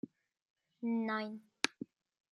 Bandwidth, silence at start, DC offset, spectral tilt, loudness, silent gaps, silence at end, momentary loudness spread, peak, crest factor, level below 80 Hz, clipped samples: 11.5 kHz; 0.05 s; under 0.1%; -3.5 dB/octave; -38 LUFS; 0.42-0.56 s; 0.45 s; 16 LU; -10 dBFS; 32 dB; under -90 dBFS; under 0.1%